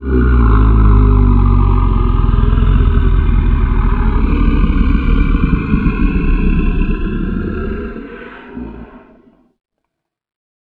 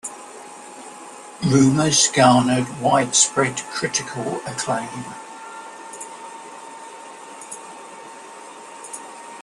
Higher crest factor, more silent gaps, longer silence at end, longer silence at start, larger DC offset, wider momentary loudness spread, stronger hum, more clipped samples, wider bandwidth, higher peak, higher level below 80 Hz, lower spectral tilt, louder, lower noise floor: second, 12 dB vs 20 dB; neither; first, 1.75 s vs 0 s; about the same, 0 s vs 0.05 s; neither; second, 16 LU vs 23 LU; neither; neither; second, 4.2 kHz vs 12.5 kHz; about the same, 0 dBFS vs -2 dBFS; first, -14 dBFS vs -58 dBFS; first, -11 dB/octave vs -3.5 dB/octave; first, -14 LUFS vs -18 LUFS; first, -75 dBFS vs -39 dBFS